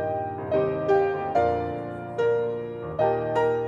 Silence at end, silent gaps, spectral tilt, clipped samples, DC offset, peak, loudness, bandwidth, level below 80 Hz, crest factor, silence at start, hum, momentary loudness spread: 0 s; none; -8 dB/octave; under 0.1%; under 0.1%; -10 dBFS; -26 LUFS; 7.4 kHz; -54 dBFS; 16 dB; 0 s; none; 9 LU